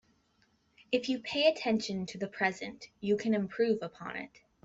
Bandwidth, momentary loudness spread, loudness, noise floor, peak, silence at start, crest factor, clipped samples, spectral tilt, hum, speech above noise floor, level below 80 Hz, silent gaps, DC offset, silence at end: 8 kHz; 14 LU; -32 LUFS; -71 dBFS; -14 dBFS; 0.9 s; 20 dB; under 0.1%; -5 dB/octave; none; 39 dB; -72 dBFS; none; under 0.1%; 0.35 s